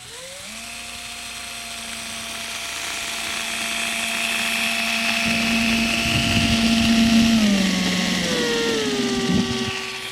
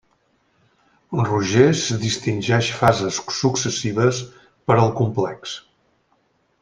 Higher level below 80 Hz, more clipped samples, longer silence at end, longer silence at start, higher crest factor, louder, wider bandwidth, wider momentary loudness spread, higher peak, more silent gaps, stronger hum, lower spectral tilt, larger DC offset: first, -42 dBFS vs -54 dBFS; neither; second, 0 s vs 1 s; second, 0 s vs 1.1 s; about the same, 16 dB vs 20 dB; about the same, -20 LUFS vs -20 LUFS; first, 16 kHz vs 10 kHz; about the same, 14 LU vs 14 LU; second, -6 dBFS vs -2 dBFS; neither; neither; second, -3 dB/octave vs -5 dB/octave; neither